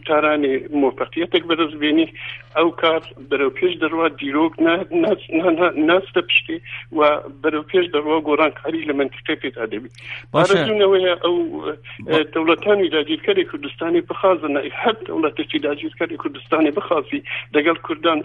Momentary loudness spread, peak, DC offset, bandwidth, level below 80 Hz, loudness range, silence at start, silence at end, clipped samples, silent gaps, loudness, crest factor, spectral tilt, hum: 9 LU; -2 dBFS; under 0.1%; 9.6 kHz; -56 dBFS; 3 LU; 0.05 s; 0 s; under 0.1%; none; -19 LUFS; 16 dB; -6 dB/octave; none